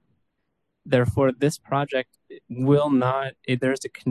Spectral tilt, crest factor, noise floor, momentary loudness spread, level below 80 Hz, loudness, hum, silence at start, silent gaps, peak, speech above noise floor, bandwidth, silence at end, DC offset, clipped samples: -6.5 dB/octave; 18 dB; -77 dBFS; 8 LU; -50 dBFS; -23 LUFS; none; 0.85 s; none; -6 dBFS; 54 dB; 12.5 kHz; 0 s; under 0.1%; under 0.1%